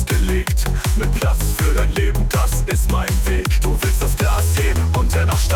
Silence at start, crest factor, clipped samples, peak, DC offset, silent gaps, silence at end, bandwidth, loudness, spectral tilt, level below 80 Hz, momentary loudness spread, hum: 0 s; 8 dB; under 0.1%; -8 dBFS; under 0.1%; none; 0 s; 18.5 kHz; -19 LUFS; -5 dB/octave; -18 dBFS; 2 LU; none